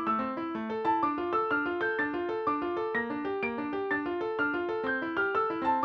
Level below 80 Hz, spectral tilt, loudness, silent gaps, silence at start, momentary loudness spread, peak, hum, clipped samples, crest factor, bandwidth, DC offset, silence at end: -64 dBFS; -7 dB/octave; -31 LUFS; none; 0 s; 4 LU; -16 dBFS; none; under 0.1%; 14 dB; 6.4 kHz; under 0.1%; 0 s